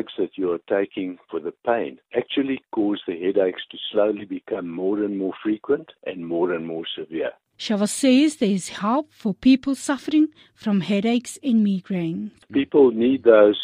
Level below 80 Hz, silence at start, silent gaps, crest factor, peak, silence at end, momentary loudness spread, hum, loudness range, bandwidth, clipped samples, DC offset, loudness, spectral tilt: -62 dBFS; 0 s; none; 20 dB; -2 dBFS; 0 s; 12 LU; none; 5 LU; 14.5 kHz; under 0.1%; under 0.1%; -22 LUFS; -5.5 dB/octave